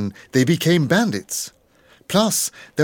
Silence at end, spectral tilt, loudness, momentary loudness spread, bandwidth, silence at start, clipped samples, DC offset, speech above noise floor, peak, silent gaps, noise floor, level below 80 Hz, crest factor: 0 s; -4.5 dB/octave; -19 LUFS; 10 LU; 17.5 kHz; 0 s; under 0.1%; under 0.1%; 35 dB; -2 dBFS; none; -54 dBFS; -64 dBFS; 18 dB